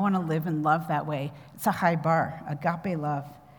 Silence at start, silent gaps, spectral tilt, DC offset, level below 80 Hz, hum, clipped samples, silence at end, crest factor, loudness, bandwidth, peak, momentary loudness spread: 0 s; none; -7 dB/octave; under 0.1%; -66 dBFS; none; under 0.1%; 0.2 s; 18 dB; -28 LUFS; over 20 kHz; -8 dBFS; 8 LU